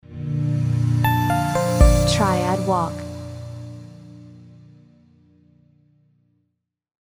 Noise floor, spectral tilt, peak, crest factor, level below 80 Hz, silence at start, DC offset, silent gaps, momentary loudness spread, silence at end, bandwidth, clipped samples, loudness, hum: -75 dBFS; -6 dB/octave; -2 dBFS; 20 dB; -28 dBFS; 0.1 s; under 0.1%; none; 22 LU; 2.75 s; over 20 kHz; under 0.1%; -20 LUFS; 60 Hz at -50 dBFS